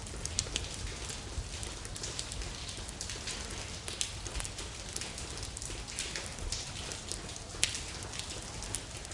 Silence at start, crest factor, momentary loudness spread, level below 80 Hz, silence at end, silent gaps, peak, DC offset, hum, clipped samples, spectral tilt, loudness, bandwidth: 0 s; 34 dB; 6 LU; -46 dBFS; 0 s; none; -6 dBFS; under 0.1%; none; under 0.1%; -2 dB/octave; -38 LUFS; 11.5 kHz